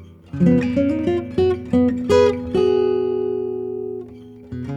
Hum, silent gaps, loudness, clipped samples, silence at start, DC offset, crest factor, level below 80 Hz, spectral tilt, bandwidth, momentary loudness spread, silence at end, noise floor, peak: none; none; -19 LUFS; under 0.1%; 0 s; under 0.1%; 16 dB; -46 dBFS; -8 dB/octave; 10 kHz; 16 LU; 0 s; -39 dBFS; -4 dBFS